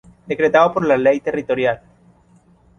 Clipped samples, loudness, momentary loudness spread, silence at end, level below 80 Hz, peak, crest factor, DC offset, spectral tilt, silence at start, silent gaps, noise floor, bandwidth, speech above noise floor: under 0.1%; -17 LUFS; 9 LU; 1 s; -54 dBFS; -2 dBFS; 18 dB; under 0.1%; -6.5 dB/octave; 0.3 s; none; -53 dBFS; 7 kHz; 36 dB